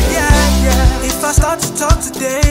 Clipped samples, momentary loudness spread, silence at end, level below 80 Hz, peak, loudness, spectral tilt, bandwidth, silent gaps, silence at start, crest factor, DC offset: under 0.1%; 5 LU; 0 s; -16 dBFS; 0 dBFS; -13 LUFS; -4 dB/octave; 16.5 kHz; none; 0 s; 12 dB; under 0.1%